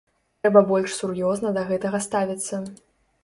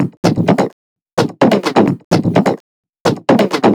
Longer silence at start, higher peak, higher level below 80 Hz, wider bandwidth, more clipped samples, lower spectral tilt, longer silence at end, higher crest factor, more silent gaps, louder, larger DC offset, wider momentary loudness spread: first, 0.45 s vs 0 s; about the same, -2 dBFS vs 0 dBFS; second, -62 dBFS vs -52 dBFS; second, 11.5 kHz vs 17 kHz; neither; second, -5 dB/octave vs -6.5 dB/octave; first, 0.5 s vs 0 s; first, 22 dB vs 14 dB; second, none vs 0.17-0.23 s, 0.73-0.96 s, 1.02-1.06 s, 1.13-1.17 s, 2.04-2.11 s, 2.60-2.83 s, 2.89-2.93 s, 3.00-3.05 s; second, -23 LUFS vs -14 LUFS; neither; first, 12 LU vs 7 LU